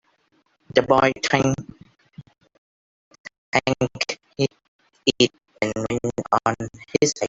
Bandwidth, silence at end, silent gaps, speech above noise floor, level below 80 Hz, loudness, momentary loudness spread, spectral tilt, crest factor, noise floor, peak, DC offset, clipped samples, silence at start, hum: 8.2 kHz; 0 s; 2.58-3.11 s, 3.20-3.24 s, 3.38-3.52 s, 4.68-4.79 s; 45 dB; -54 dBFS; -22 LUFS; 12 LU; -4 dB/octave; 22 dB; -65 dBFS; -2 dBFS; under 0.1%; under 0.1%; 0.75 s; none